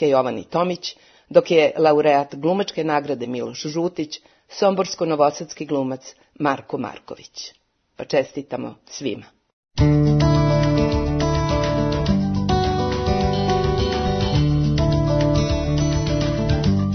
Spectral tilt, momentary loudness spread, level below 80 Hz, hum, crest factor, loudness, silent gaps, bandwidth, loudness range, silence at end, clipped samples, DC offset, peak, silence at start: -6.5 dB/octave; 15 LU; -32 dBFS; none; 20 dB; -20 LUFS; 9.53-9.63 s; 6.6 kHz; 7 LU; 0 s; under 0.1%; under 0.1%; 0 dBFS; 0 s